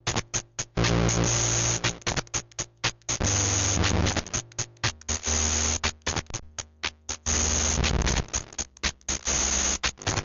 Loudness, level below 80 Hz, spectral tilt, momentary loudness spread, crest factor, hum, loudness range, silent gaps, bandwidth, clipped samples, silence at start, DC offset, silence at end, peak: -26 LUFS; -36 dBFS; -2.5 dB/octave; 9 LU; 14 dB; none; 2 LU; none; 7.8 kHz; under 0.1%; 0.05 s; under 0.1%; 0 s; -12 dBFS